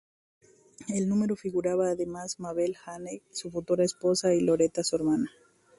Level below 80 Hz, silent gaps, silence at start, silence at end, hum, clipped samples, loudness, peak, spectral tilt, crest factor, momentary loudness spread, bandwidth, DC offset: -64 dBFS; none; 0.8 s; 0.5 s; none; under 0.1%; -28 LUFS; -12 dBFS; -5 dB/octave; 16 dB; 13 LU; 11.5 kHz; under 0.1%